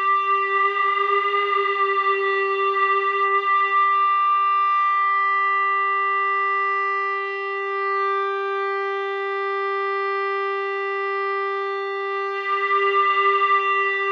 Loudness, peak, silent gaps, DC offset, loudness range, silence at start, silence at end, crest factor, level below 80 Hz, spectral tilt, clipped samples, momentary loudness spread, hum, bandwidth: -20 LUFS; -8 dBFS; none; under 0.1%; 5 LU; 0 s; 0 s; 12 dB; -86 dBFS; -1.5 dB/octave; under 0.1%; 7 LU; none; 6.2 kHz